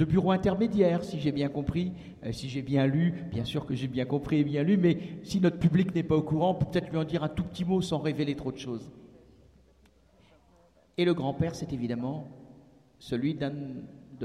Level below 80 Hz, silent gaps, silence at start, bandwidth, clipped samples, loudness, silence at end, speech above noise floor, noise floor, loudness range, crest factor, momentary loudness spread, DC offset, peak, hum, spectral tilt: -54 dBFS; none; 0 s; 11.5 kHz; under 0.1%; -29 LUFS; 0 s; 34 dB; -62 dBFS; 7 LU; 18 dB; 13 LU; under 0.1%; -12 dBFS; none; -7.5 dB/octave